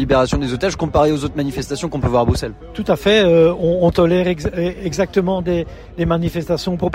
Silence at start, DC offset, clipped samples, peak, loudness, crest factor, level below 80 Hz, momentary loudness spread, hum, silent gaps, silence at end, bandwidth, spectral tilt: 0 s; under 0.1%; under 0.1%; -2 dBFS; -17 LUFS; 14 dB; -32 dBFS; 10 LU; none; none; 0 s; 16 kHz; -6 dB/octave